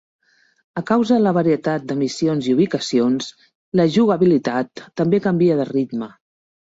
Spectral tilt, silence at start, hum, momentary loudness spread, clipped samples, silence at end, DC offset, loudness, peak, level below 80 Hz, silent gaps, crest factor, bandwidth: -6.5 dB/octave; 0.75 s; none; 12 LU; under 0.1%; 0.7 s; under 0.1%; -19 LUFS; -4 dBFS; -60 dBFS; 3.55-3.72 s; 14 dB; 7.8 kHz